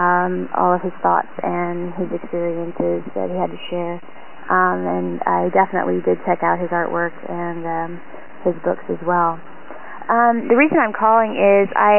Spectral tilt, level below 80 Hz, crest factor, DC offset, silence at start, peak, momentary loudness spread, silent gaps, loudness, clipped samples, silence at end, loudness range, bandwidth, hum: -10.5 dB/octave; -64 dBFS; 16 dB; 3%; 0 s; -2 dBFS; 12 LU; none; -19 LUFS; under 0.1%; 0 s; 5 LU; 3.2 kHz; none